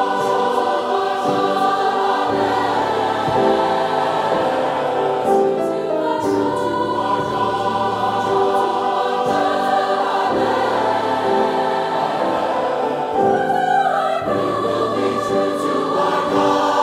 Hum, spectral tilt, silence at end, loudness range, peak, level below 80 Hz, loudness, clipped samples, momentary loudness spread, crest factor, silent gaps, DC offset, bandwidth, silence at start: none; -5 dB/octave; 0 s; 1 LU; -4 dBFS; -56 dBFS; -18 LUFS; under 0.1%; 3 LU; 14 dB; none; under 0.1%; 15 kHz; 0 s